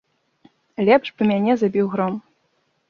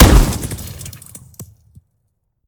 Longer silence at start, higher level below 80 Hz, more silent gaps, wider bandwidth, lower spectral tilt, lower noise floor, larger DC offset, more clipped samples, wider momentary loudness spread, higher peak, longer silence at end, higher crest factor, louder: first, 0.8 s vs 0 s; second, -64 dBFS vs -18 dBFS; neither; second, 6.8 kHz vs over 20 kHz; first, -8 dB/octave vs -5 dB/octave; about the same, -67 dBFS vs -67 dBFS; neither; second, under 0.1% vs 0.5%; second, 11 LU vs 25 LU; about the same, -2 dBFS vs 0 dBFS; second, 0.7 s vs 1.05 s; about the same, 18 dB vs 16 dB; about the same, -19 LUFS vs -17 LUFS